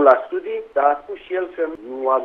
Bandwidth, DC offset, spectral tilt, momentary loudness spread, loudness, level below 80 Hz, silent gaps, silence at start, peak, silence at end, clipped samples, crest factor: 4.7 kHz; under 0.1%; -6 dB/octave; 8 LU; -22 LUFS; -60 dBFS; none; 0 s; 0 dBFS; 0 s; under 0.1%; 20 dB